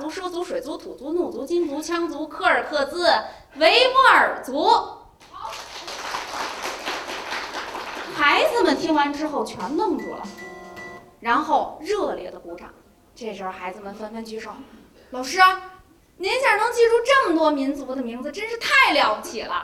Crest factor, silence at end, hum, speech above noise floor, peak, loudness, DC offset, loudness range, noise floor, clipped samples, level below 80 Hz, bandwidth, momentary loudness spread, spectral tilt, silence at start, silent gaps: 20 dB; 0 s; none; 28 dB; -2 dBFS; -21 LUFS; under 0.1%; 8 LU; -50 dBFS; under 0.1%; -56 dBFS; 16.5 kHz; 19 LU; -2.5 dB/octave; 0 s; none